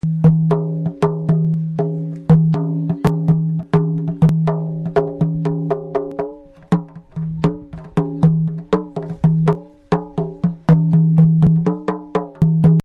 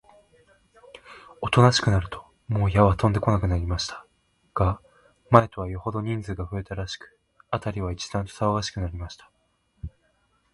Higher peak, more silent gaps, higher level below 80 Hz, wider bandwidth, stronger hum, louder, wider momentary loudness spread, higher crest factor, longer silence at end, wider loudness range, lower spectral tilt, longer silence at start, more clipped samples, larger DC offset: about the same, -2 dBFS vs 0 dBFS; neither; about the same, -42 dBFS vs -40 dBFS; second, 4.9 kHz vs 11.5 kHz; neither; first, -17 LUFS vs -25 LUFS; second, 10 LU vs 21 LU; second, 14 dB vs 26 dB; second, 0.05 s vs 0.65 s; second, 5 LU vs 8 LU; first, -10.5 dB/octave vs -6 dB/octave; second, 0.05 s vs 1.05 s; neither; neither